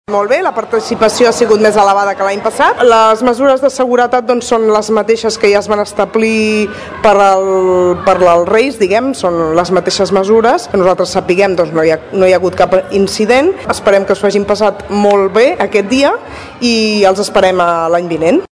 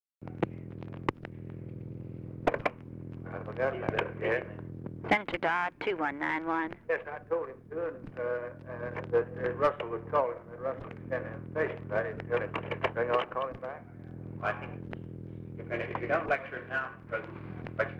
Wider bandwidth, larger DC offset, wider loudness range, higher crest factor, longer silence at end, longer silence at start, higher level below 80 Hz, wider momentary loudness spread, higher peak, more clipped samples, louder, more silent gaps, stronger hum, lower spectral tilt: first, 11 kHz vs 9.2 kHz; neither; about the same, 2 LU vs 4 LU; second, 10 dB vs 18 dB; about the same, 0.05 s vs 0 s; about the same, 0.1 s vs 0.2 s; first, -42 dBFS vs -58 dBFS; second, 5 LU vs 13 LU; first, 0 dBFS vs -16 dBFS; first, 1% vs under 0.1%; first, -10 LUFS vs -34 LUFS; neither; neither; second, -4.5 dB/octave vs -7.5 dB/octave